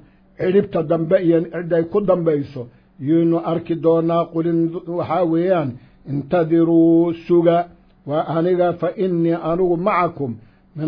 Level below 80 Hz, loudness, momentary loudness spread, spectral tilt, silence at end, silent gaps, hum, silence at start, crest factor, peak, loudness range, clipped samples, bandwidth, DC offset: -52 dBFS; -18 LUFS; 13 LU; -11 dB/octave; 0 s; none; none; 0.4 s; 14 dB; -4 dBFS; 2 LU; under 0.1%; 5.2 kHz; under 0.1%